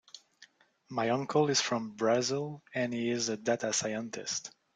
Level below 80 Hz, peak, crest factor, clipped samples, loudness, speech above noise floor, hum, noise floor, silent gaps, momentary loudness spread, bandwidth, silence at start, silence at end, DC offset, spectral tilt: -74 dBFS; -14 dBFS; 18 dB; under 0.1%; -32 LUFS; 30 dB; none; -62 dBFS; none; 9 LU; 10.5 kHz; 0.15 s; 0.25 s; under 0.1%; -3.5 dB/octave